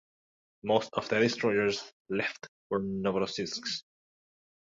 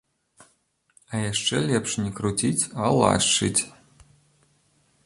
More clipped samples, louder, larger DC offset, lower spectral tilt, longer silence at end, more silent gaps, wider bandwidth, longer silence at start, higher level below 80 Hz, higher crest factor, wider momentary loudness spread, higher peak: neither; second, -31 LUFS vs -23 LUFS; neither; about the same, -4.5 dB/octave vs -3.5 dB/octave; second, 0.9 s vs 1.35 s; first, 1.93-2.05 s, 2.48-2.70 s vs none; second, 7.8 kHz vs 11.5 kHz; second, 0.65 s vs 1.1 s; second, -66 dBFS vs -52 dBFS; about the same, 22 dB vs 22 dB; about the same, 10 LU vs 9 LU; second, -10 dBFS vs -4 dBFS